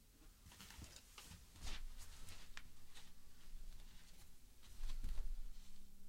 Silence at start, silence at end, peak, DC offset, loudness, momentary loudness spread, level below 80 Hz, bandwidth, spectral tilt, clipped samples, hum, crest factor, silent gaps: 0 s; 0 s; -30 dBFS; under 0.1%; -58 LUFS; 12 LU; -50 dBFS; 16 kHz; -3 dB/octave; under 0.1%; none; 18 dB; none